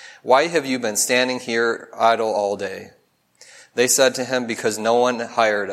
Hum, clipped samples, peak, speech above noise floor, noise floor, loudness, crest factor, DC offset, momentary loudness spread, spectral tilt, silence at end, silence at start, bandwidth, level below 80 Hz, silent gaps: none; under 0.1%; -2 dBFS; 33 dB; -53 dBFS; -19 LUFS; 18 dB; under 0.1%; 7 LU; -2 dB/octave; 0 s; 0 s; 16 kHz; -74 dBFS; none